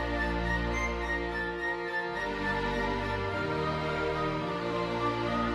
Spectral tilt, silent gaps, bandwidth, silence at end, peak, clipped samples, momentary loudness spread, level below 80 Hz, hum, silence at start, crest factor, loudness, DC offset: -6 dB/octave; none; 13 kHz; 0 s; -18 dBFS; under 0.1%; 2 LU; -42 dBFS; none; 0 s; 14 dB; -31 LUFS; under 0.1%